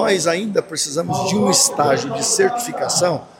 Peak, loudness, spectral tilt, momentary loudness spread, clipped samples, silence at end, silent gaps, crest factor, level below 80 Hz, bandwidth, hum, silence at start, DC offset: -2 dBFS; -17 LUFS; -3 dB/octave; 7 LU; under 0.1%; 0.15 s; none; 16 dB; -60 dBFS; 17 kHz; none; 0 s; under 0.1%